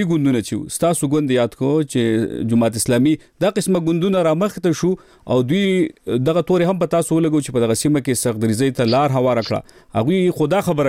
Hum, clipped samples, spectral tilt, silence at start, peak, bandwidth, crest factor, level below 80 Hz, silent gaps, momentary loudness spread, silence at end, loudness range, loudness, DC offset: none; under 0.1%; -6 dB/octave; 0 s; -8 dBFS; 16.5 kHz; 10 dB; -50 dBFS; none; 4 LU; 0 s; 1 LU; -18 LUFS; under 0.1%